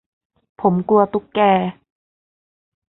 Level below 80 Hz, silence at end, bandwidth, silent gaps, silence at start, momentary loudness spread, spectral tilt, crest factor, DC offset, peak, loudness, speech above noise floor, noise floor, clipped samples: -58 dBFS; 1.2 s; 4.1 kHz; none; 0.6 s; 5 LU; -12 dB/octave; 18 dB; under 0.1%; -2 dBFS; -18 LUFS; over 74 dB; under -90 dBFS; under 0.1%